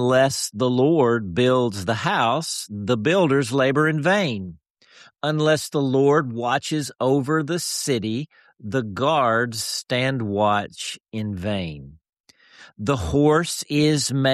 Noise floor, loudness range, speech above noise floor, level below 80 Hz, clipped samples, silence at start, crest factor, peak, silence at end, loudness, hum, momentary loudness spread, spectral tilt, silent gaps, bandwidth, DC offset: -52 dBFS; 4 LU; 31 dB; -50 dBFS; under 0.1%; 0 s; 14 dB; -6 dBFS; 0 s; -21 LUFS; none; 10 LU; -5 dB/octave; 4.70-4.75 s, 12.20-12.24 s; 13.5 kHz; under 0.1%